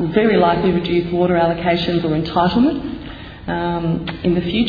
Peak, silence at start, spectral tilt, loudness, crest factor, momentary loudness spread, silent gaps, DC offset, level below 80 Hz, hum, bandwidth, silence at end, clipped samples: -2 dBFS; 0 s; -9 dB/octave; -17 LUFS; 16 dB; 11 LU; none; under 0.1%; -38 dBFS; none; 5 kHz; 0 s; under 0.1%